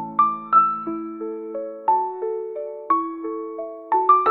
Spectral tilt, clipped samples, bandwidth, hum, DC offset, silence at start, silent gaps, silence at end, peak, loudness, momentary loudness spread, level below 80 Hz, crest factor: -9 dB/octave; under 0.1%; 4.2 kHz; none; under 0.1%; 0 s; none; 0 s; -4 dBFS; -22 LUFS; 14 LU; -74 dBFS; 18 dB